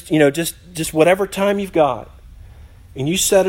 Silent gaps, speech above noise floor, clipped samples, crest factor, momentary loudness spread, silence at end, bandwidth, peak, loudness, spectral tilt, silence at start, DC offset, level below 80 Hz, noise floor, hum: none; 24 dB; under 0.1%; 16 dB; 11 LU; 0 s; 16.5 kHz; 0 dBFS; -17 LUFS; -4 dB/octave; 0.05 s; under 0.1%; -44 dBFS; -41 dBFS; none